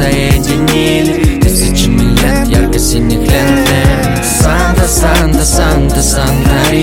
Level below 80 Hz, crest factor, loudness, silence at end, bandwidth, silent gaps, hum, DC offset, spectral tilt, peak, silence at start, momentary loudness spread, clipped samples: -14 dBFS; 8 dB; -10 LUFS; 0 s; 17 kHz; none; none; under 0.1%; -4.5 dB/octave; 0 dBFS; 0 s; 2 LU; under 0.1%